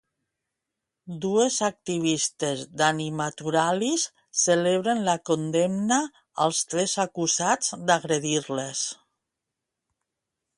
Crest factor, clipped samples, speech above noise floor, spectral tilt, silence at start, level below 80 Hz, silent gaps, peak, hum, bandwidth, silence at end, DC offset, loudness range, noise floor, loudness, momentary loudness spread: 20 dB; under 0.1%; 60 dB; -3.5 dB/octave; 1.05 s; -70 dBFS; none; -6 dBFS; none; 11.5 kHz; 1.65 s; under 0.1%; 3 LU; -85 dBFS; -25 LUFS; 7 LU